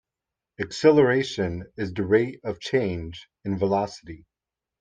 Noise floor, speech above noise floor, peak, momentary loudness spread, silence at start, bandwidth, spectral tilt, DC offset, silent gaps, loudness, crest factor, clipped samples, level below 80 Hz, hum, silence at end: -88 dBFS; 64 dB; -6 dBFS; 16 LU; 0.6 s; 9.2 kHz; -6 dB/octave; under 0.1%; none; -24 LUFS; 20 dB; under 0.1%; -56 dBFS; none; 0.65 s